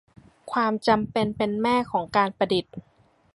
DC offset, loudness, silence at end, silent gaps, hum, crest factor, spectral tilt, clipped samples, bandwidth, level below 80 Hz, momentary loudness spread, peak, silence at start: under 0.1%; -24 LUFS; 0.55 s; none; none; 20 dB; -6 dB/octave; under 0.1%; 11.5 kHz; -58 dBFS; 6 LU; -6 dBFS; 0.45 s